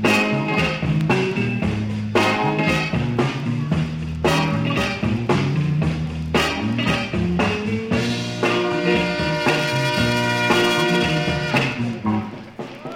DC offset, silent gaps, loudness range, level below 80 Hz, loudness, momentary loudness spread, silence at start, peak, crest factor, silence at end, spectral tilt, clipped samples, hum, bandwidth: under 0.1%; none; 2 LU; -40 dBFS; -20 LUFS; 6 LU; 0 s; -6 dBFS; 14 dB; 0 s; -5.5 dB/octave; under 0.1%; none; 16.5 kHz